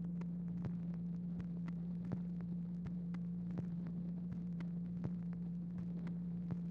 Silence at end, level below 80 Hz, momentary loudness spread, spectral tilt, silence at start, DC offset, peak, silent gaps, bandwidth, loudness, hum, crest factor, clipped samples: 0 s; -62 dBFS; 1 LU; -11 dB/octave; 0 s; under 0.1%; -28 dBFS; none; 3.1 kHz; -44 LUFS; none; 14 dB; under 0.1%